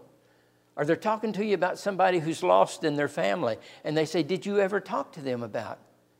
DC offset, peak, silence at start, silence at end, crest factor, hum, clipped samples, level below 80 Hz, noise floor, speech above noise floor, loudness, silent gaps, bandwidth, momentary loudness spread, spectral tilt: under 0.1%; -8 dBFS; 0.75 s; 0.45 s; 20 dB; none; under 0.1%; -78 dBFS; -64 dBFS; 37 dB; -27 LUFS; none; 16 kHz; 11 LU; -5.5 dB/octave